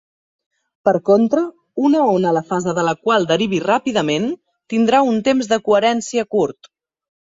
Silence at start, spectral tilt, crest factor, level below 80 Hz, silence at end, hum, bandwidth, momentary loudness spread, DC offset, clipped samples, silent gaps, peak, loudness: 0.85 s; -5 dB/octave; 16 dB; -60 dBFS; 0.7 s; none; 7.8 kHz; 7 LU; under 0.1%; under 0.1%; none; -2 dBFS; -17 LUFS